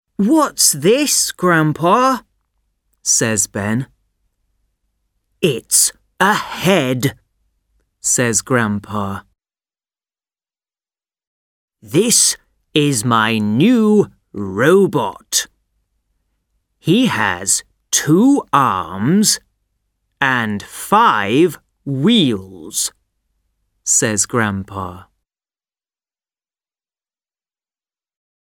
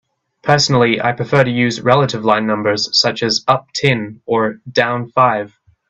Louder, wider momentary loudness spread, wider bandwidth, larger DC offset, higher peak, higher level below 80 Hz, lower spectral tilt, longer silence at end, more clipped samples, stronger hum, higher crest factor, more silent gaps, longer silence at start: about the same, -15 LUFS vs -15 LUFS; first, 12 LU vs 5 LU; first, over 20 kHz vs 8.4 kHz; neither; about the same, 0 dBFS vs 0 dBFS; about the same, -56 dBFS vs -52 dBFS; about the same, -3.5 dB/octave vs -4.5 dB/octave; first, 3.55 s vs 0.45 s; neither; neither; about the same, 18 dB vs 16 dB; first, 11.27-11.68 s vs none; second, 0.2 s vs 0.45 s